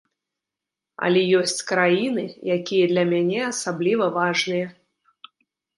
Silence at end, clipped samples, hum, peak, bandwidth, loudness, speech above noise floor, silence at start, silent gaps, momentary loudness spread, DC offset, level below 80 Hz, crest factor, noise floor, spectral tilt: 1.05 s; under 0.1%; none; -4 dBFS; 11.5 kHz; -21 LUFS; 65 dB; 1 s; none; 7 LU; under 0.1%; -72 dBFS; 18 dB; -86 dBFS; -4.5 dB/octave